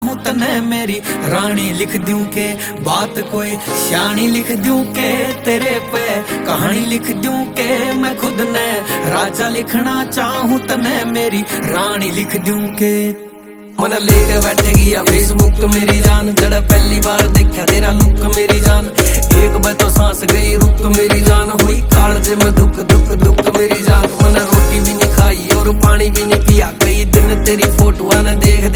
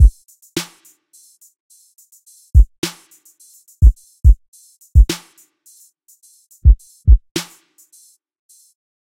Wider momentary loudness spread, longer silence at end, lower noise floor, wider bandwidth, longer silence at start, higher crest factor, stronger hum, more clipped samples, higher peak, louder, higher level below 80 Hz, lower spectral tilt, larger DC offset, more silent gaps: second, 7 LU vs 11 LU; second, 0 s vs 1.6 s; second, -34 dBFS vs -52 dBFS; first, 19.5 kHz vs 15 kHz; about the same, 0 s vs 0 s; about the same, 12 dB vs 16 dB; neither; about the same, 0.2% vs 0.2%; about the same, 0 dBFS vs 0 dBFS; first, -13 LUFS vs -17 LUFS; about the same, -16 dBFS vs -18 dBFS; about the same, -4.5 dB/octave vs -5.5 dB/octave; neither; second, none vs 1.60-1.70 s, 2.78-2.82 s, 4.48-4.53 s, 7.31-7.35 s